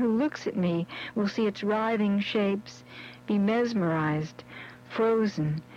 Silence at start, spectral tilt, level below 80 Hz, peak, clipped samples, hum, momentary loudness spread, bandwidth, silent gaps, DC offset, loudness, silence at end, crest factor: 0 s; -7 dB/octave; -66 dBFS; -16 dBFS; under 0.1%; none; 17 LU; 7.4 kHz; none; under 0.1%; -28 LUFS; 0 s; 12 dB